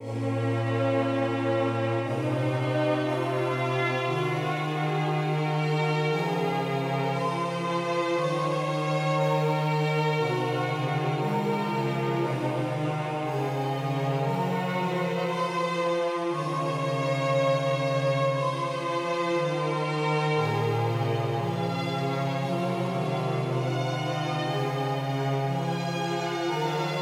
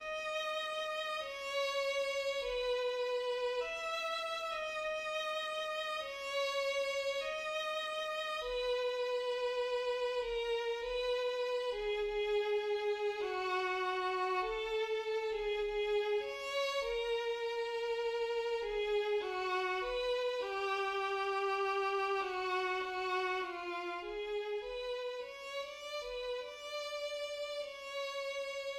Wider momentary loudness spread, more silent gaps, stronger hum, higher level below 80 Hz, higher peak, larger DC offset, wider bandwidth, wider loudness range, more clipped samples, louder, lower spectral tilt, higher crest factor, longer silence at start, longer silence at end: second, 3 LU vs 6 LU; neither; neither; second, -74 dBFS vs -64 dBFS; first, -14 dBFS vs -24 dBFS; neither; about the same, 14.5 kHz vs 15.5 kHz; about the same, 2 LU vs 4 LU; neither; first, -27 LUFS vs -37 LUFS; first, -6.5 dB/octave vs -2 dB/octave; about the same, 14 dB vs 12 dB; about the same, 0 s vs 0 s; about the same, 0 s vs 0 s